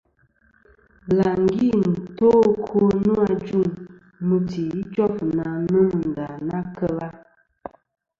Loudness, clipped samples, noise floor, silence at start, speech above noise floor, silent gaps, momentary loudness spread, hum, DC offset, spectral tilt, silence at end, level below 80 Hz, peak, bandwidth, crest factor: -21 LUFS; under 0.1%; -61 dBFS; 1.05 s; 41 dB; none; 15 LU; none; under 0.1%; -9.5 dB/octave; 1 s; -52 dBFS; -6 dBFS; 7.2 kHz; 16 dB